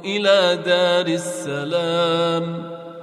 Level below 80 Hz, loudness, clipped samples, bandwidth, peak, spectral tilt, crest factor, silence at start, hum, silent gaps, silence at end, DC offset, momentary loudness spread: -68 dBFS; -19 LUFS; under 0.1%; 12.5 kHz; -4 dBFS; -4.5 dB/octave; 14 dB; 0 s; none; none; 0 s; under 0.1%; 11 LU